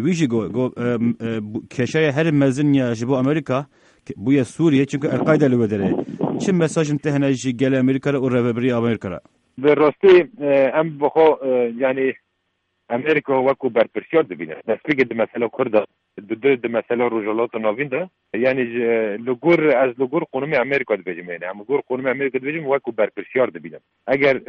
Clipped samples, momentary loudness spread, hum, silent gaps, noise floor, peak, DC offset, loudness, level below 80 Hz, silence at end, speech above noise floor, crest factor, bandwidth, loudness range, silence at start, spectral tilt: under 0.1%; 10 LU; none; none; -72 dBFS; -2 dBFS; under 0.1%; -19 LUFS; -60 dBFS; 0.05 s; 53 dB; 16 dB; 10 kHz; 4 LU; 0 s; -7 dB/octave